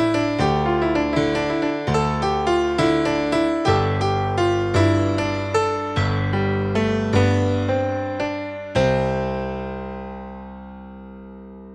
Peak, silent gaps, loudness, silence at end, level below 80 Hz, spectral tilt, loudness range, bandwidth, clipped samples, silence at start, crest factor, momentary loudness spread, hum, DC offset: -4 dBFS; none; -21 LUFS; 0 s; -40 dBFS; -6.5 dB/octave; 5 LU; 10 kHz; under 0.1%; 0 s; 16 dB; 17 LU; none; under 0.1%